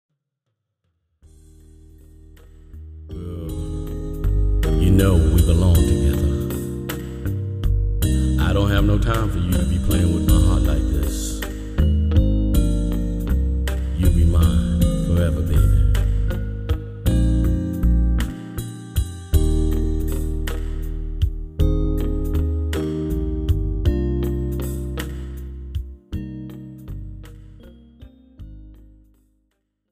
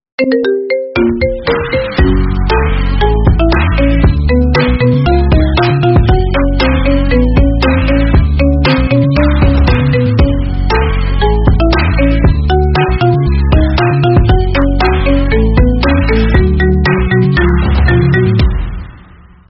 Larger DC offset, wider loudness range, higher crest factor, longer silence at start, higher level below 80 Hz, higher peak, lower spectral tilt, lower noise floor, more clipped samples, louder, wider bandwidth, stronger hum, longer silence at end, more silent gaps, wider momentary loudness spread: second, under 0.1% vs 0.2%; first, 15 LU vs 1 LU; first, 16 dB vs 10 dB; first, 2.7 s vs 0.2 s; second, -22 dBFS vs -12 dBFS; second, -4 dBFS vs 0 dBFS; second, -7 dB/octave vs -10 dB/octave; first, -77 dBFS vs -38 dBFS; neither; second, -21 LUFS vs -11 LUFS; first, 15.5 kHz vs 5.8 kHz; neither; first, 1.15 s vs 0.5 s; neither; first, 15 LU vs 3 LU